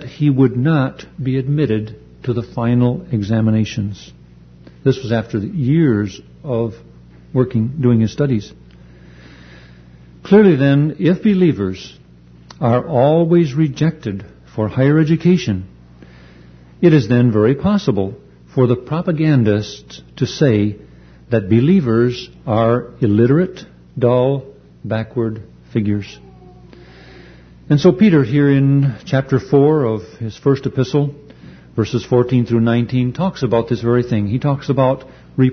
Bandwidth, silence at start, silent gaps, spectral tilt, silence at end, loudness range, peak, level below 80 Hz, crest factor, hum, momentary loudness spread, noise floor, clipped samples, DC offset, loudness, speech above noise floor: 6.6 kHz; 0 s; none; -8.5 dB/octave; 0 s; 5 LU; 0 dBFS; -46 dBFS; 16 dB; 60 Hz at -40 dBFS; 12 LU; -43 dBFS; under 0.1%; under 0.1%; -16 LUFS; 28 dB